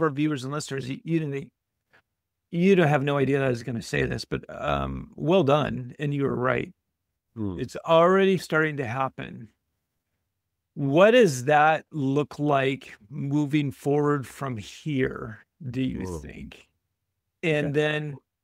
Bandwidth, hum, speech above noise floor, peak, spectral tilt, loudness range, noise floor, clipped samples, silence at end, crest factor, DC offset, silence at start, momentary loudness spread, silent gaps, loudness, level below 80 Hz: 15.5 kHz; none; 58 dB; -4 dBFS; -6.5 dB/octave; 7 LU; -83 dBFS; under 0.1%; 0.25 s; 22 dB; under 0.1%; 0 s; 16 LU; none; -25 LUFS; -52 dBFS